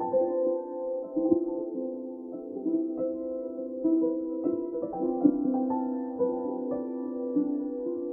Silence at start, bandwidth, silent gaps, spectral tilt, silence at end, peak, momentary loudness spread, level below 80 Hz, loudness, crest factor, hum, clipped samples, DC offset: 0 s; 1.9 kHz; none; -13.5 dB/octave; 0 s; -10 dBFS; 9 LU; -68 dBFS; -30 LUFS; 20 dB; none; under 0.1%; under 0.1%